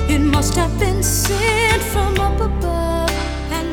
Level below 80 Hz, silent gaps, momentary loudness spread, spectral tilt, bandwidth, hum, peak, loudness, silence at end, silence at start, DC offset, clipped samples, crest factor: -22 dBFS; none; 5 LU; -4.5 dB/octave; 20 kHz; none; -2 dBFS; -18 LUFS; 0 s; 0 s; under 0.1%; under 0.1%; 14 dB